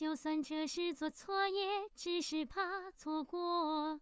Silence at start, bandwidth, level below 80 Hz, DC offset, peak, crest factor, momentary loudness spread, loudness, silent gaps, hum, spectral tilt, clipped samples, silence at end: 0 s; 8 kHz; -72 dBFS; under 0.1%; -24 dBFS; 14 dB; 5 LU; -39 LUFS; none; none; -2 dB/octave; under 0.1%; 0 s